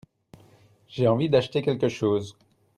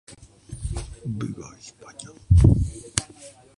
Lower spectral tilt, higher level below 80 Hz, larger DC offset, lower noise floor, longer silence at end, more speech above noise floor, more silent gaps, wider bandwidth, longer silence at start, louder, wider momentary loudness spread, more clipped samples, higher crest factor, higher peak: about the same, -7 dB/octave vs -6 dB/octave; second, -62 dBFS vs -30 dBFS; neither; first, -57 dBFS vs -47 dBFS; first, 0.45 s vs 0.3 s; first, 33 dB vs 13 dB; neither; about the same, 11.5 kHz vs 11.5 kHz; first, 0.9 s vs 0.5 s; about the same, -24 LUFS vs -23 LUFS; second, 11 LU vs 25 LU; neither; second, 18 dB vs 24 dB; second, -10 dBFS vs 0 dBFS